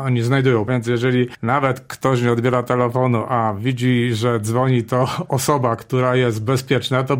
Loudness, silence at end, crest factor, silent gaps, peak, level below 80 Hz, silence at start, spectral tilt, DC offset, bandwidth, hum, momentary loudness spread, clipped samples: -19 LUFS; 0 s; 16 dB; none; -2 dBFS; -54 dBFS; 0 s; -6.5 dB/octave; under 0.1%; 16.5 kHz; none; 3 LU; under 0.1%